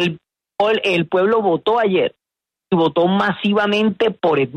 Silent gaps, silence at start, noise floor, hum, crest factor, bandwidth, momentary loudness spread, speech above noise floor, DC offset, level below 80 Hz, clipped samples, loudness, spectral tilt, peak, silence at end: none; 0 s; -86 dBFS; none; 14 dB; 9 kHz; 6 LU; 70 dB; under 0.1%; -60 dBFS; under 0.1%; -17 LUFS; -6.5 dB/octave; -4 dBFS; 0 s